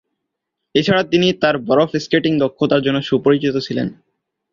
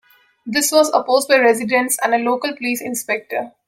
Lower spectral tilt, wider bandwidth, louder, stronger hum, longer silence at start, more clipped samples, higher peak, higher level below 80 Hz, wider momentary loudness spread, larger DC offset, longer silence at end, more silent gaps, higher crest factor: first, -6 dB/octave vs -2 dB/octave; second, 7.4 kHz vs 16.5 kHz; about the same, -17 LUFS vs -17 LUFS; neither; first, 0.75 s vs 0.45 s; neither; about the same, -2 dBFS vs -2 dBFS; first, -54 dBFS vs -68 dBFS; second, 6 LU vs 9 LU; neither; first, 0.6 s vs 0.2 s; neither; about the same, 16 dB vs 16 dB